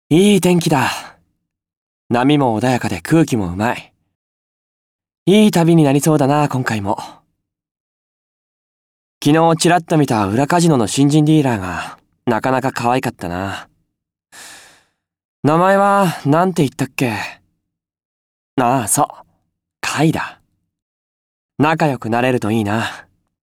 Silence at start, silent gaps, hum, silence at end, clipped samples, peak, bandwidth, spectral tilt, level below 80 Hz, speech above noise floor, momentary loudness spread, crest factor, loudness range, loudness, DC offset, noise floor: 0.1 s; 1.77-2.10 s, 4.15-4.99 s, 5.18-5.26 s, 7.71-9.21 s, 15.25-15.43 s, 18.05-18.57 s, 20.82-21.49 s; none; 0.45 s; under 0.1%; -2 dBFS; 17 kHz; -5.5 dB/octave; -52 dBFS; 62 dB; 13 LU; 14 dB; 6 LU; -16 LUFS; under 0.1%; -77 dBFS